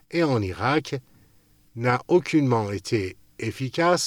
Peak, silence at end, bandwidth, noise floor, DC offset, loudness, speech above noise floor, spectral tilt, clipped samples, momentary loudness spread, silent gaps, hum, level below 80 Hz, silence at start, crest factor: -6 dBFS; 0 s; 15.5 kHz; -59 dBFS; under 0.1%; -24 LUFS; 36 dB; -5.5 dB/octave; under 0.1%; 13 LU; none; none; -62 dBFS; 0.1 s; 18 dB